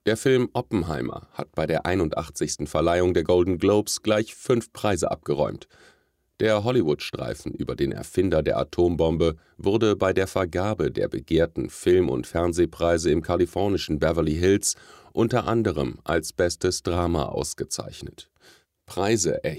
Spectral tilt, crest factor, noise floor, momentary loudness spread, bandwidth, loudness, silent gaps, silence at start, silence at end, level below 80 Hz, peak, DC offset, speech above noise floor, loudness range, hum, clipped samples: -5 dB/octave; 18 dB; -57 dBFS; 9 LU; 15.5 kHz; -24 LUFS; none; 0.05 s; 0 s; -44 dBFS; -6 dBFS; under 0.1%; 33 dB; 3 LU; none; under 0.1%